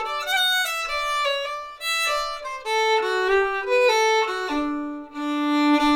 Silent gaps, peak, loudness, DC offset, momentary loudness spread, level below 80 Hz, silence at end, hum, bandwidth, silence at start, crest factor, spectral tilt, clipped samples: none; -8 dBFS; -22 LUFS; under 0.1%; 10 LU; -52 dBFS; 0 s; none; 19.5 kHz; 0 s; 14 dB; -1 dB/octave; under 0.1%